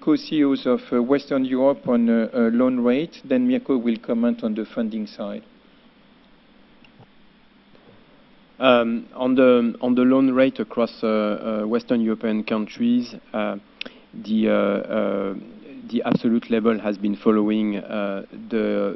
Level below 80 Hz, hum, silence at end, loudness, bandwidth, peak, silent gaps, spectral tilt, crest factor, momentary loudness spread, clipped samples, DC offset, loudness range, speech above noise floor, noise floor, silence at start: -62 dBFS; none; 0 s; -21 LUFS; 6 kHz; 0 dBFS; none; -8 dB/octave; 22 dB; 12 LU; under 0.1%; under 0.1%; 8 LU; 32 dB; -53 dBFS; 0 s